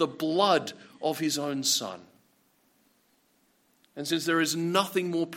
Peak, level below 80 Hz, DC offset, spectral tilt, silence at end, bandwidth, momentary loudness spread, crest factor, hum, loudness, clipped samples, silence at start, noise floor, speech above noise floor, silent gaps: -10 dBFS; -80 dBFS; under 0.1%; -3 dB/octave; 0 s; 16.5 kHz; 15 LU; 20 dB; none; -27 LUFS; under 0.1%; 0 s; -68 dBFS; 40 dB; none